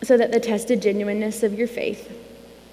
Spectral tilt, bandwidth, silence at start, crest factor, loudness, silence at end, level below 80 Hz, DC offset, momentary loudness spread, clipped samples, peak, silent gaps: -5 dB/octave; 15.5 kHz; 0 s; 18 dB; -22 LUFS; 0.2 s; -58 dBFS; under 0.1%; 17 LU; under 0.1%; -4 dBFS; none